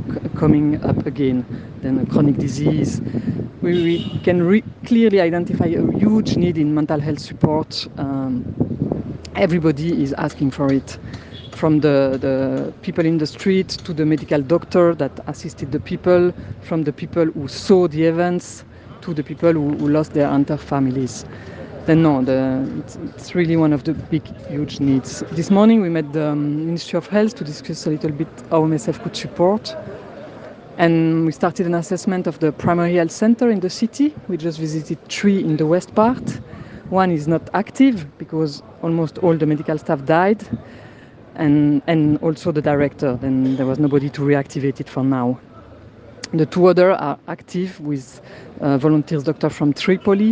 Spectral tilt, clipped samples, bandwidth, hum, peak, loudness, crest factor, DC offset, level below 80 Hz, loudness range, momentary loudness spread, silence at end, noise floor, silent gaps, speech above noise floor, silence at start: -7 dB/octave; under 0.1%; 9.4 kHz; none; 0 dBFS; -19 LUFS; 18 dB; under 0.1%; -50 dBFS; 3 LU; 12 LU; 0 s; -42 dBFS; none; 24 dB; 0 s